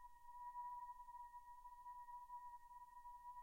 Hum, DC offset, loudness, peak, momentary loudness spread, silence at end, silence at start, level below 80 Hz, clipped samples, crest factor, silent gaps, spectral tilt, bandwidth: none; under 0.1%; -57 LUFS; -46 dBFS; 8 LU; 0 s; 0 s; -74 dBFS; under 0.1%; 12 dB; none; -2 dB/octave; 16 kHz